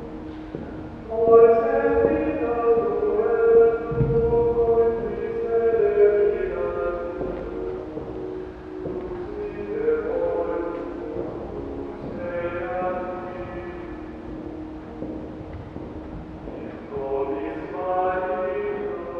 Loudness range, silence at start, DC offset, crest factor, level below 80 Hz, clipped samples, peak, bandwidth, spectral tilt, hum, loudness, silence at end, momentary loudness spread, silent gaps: 13 LU; 0 s; under 0.1%; 20 dB; -42 dBFS; under 0.1%; -4 dBFS; 4.7 kHz; -9.5 dB/octave; none; -23 LUFS; 0 s; 18 LU; none